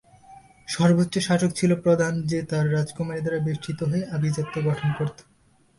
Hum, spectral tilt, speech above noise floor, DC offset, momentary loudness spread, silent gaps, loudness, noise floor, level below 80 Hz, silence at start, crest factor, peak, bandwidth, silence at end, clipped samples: none; -6.5 dB/octave; 37 dB; under 0.1%; 8 LU; none; -24 LUFS; -61 dBFS; -56 dBFS; 0.3 s; 16 dB; -8 dBFS; 11.5 kHz; 0.55 s; under 0.1%